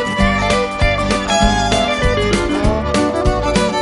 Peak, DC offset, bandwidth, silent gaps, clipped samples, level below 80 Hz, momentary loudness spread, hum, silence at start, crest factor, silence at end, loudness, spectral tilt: -2 dBFS; under 0.1%; 11.5 kHz; none; under 0.1%; -22 dBFS; 2 LU; none; 0 s; 14 dB; 0 s; -15 LUFS; -4.5 dB/octave